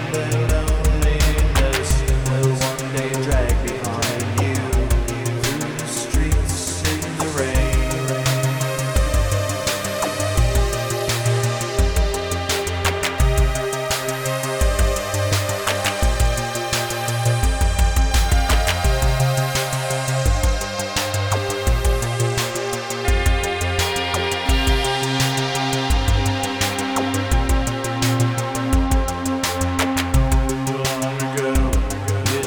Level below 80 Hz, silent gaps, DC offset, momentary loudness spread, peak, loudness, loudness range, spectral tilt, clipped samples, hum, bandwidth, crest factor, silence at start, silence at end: -22 dBFS; none; under 0.1%; 4 LU; -6 dBFS; -20 LUFS; 2 LU; -4.5 dB/octave; under 0.1%; none; over 20 kHz; 14 dB; 0 s; 0 s